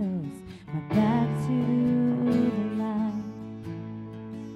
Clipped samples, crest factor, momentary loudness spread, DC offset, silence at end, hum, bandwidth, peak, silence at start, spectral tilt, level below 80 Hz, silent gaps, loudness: under 0.1%; 16 dB; 15 LU; under 0.1%; 0 s; none; 11.5 kHz; -12 dBFS; 0 s; -9 dB/octave; -56 dBFS; none; -27 LUFS